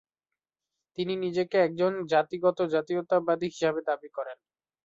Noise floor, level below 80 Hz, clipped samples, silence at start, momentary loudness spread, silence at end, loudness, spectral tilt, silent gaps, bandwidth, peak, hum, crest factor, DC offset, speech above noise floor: under -90 dBFS; -74 dBFS; under 0.1%; 1 s; 11 LU; 0.5 s; -28 LUFS; -6 dB/octave; none; 7.8 kHz; -12 dBFS; none; 18 dB; under 0.1%; over 63 dB